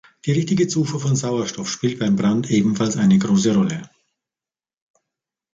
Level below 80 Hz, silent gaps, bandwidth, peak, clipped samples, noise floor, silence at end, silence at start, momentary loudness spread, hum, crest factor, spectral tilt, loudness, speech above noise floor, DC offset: -56 dBFS; none; 7.8 kHz; -6 dBFS; under 0.1%; under -90 dBFS; 1.7 s; 0.25 s; 7 LU; none; 14 dB; -6 dB/octave; -19 LUFS; over 71 dB; under 0.1%